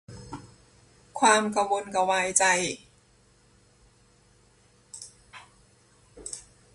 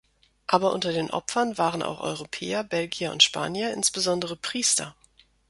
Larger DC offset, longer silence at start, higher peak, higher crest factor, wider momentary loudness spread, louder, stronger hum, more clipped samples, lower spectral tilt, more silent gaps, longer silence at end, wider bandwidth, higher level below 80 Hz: neither; second, 0.1 s vs 0.5 s; about the same, -4 dBFS vs -2 dBFS; about the same, 26 dB vs 26 dB; first, 23 LU vs 11 LU; about the same, -23 LUFS vs -25 LUFS; neither; neither; about the same, -2 dB/octave vs -2 dB/octave; neither; second, 0.35 s vs 0.6 s; about the same, 11.5 kHz vs 12 kHz; about the same, -62 dBFS vs -62 dBFS